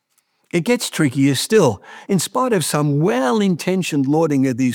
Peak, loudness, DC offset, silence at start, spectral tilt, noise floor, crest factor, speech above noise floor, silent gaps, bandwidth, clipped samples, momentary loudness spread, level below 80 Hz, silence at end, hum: -2 dBFS; -18 LUFS; under 0.1%; 0.55 s; -5.5 dB/octave; -65 dBFS; 16 dB; 48 dB; none; 20 kHz; under 0.1%; 5 LU; -66 dBFS; 0 s; none